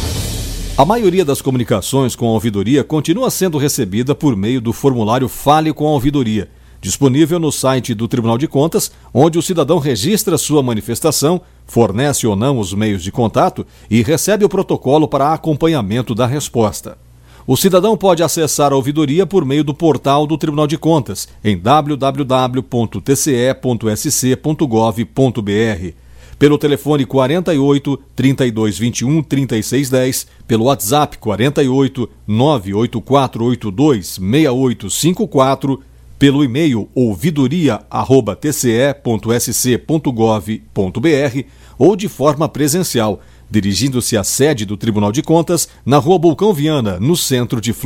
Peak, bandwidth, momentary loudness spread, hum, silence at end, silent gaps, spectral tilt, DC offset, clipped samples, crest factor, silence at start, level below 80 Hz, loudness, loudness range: 0 dBFS; 17 kHz; 6 LU; none; 0 s; none; -5.5 dB/octave; under 0.1%; under 0.1%; 14 dB; 0 s; -38 dBFS; -14 LUFS; 1 LU